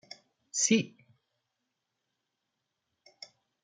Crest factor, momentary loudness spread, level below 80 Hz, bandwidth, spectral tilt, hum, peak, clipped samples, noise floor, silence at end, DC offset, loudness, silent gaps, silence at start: 24 dB; 25 LU; -82 dBFS; 9.8 kHz; -3 dB/octave; none; -14 dBFS; under 0.1%; -84 dBFS; 2.75 s; under 0.1%; -28 LUFS; none; 0.55 s